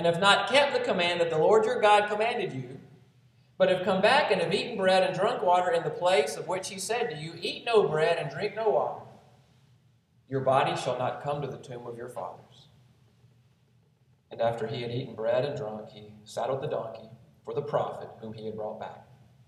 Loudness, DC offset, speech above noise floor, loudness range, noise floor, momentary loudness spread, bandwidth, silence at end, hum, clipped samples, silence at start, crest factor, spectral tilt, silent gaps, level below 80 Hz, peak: -27 LUFS; under 0.1%; 38 dB; 10 LU; -65 dBFS; 18 LU; 13 kHz; 0.45 s; none; under 0.1%; 0 s; 22 dB; -4.5 dB/octave; none; -72 dBFS; -6 dBFS